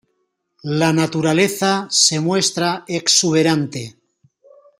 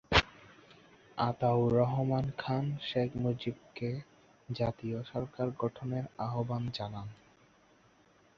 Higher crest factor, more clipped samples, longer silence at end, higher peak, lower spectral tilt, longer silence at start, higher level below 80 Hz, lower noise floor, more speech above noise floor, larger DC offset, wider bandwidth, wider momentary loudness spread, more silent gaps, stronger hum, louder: second, 18 dB vs 28 dB; neither; second, 0.9 s vs 1.25 s; first, 0 dBFS vs -8 dBFS; second, -3.5 dB/octave vs -6.5 dB/octave; first, 0.65 s vs 0.1 s; second, -60 dBFS vs -54 dBFS; first, -70 dBFS vs -65 dBFS; first, 53 dB vs 32 dB; neither; first, 16 kHz vs 7.2 kHz; about the same, 12 LU vs 13 LU; neither; neither; first, -16 LUFS vs -34 LUFS